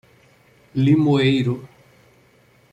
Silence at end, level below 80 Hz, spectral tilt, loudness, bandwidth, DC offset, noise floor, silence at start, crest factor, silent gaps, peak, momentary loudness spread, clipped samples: 1.05 s; -58 dBFS; -8 dB/octave; -19 LUFS; 9 kHz; under 0.1%; -55 dBFS; 0.75 s; 16 dB; none; -6 dBFS; 13 LU; under 0.1%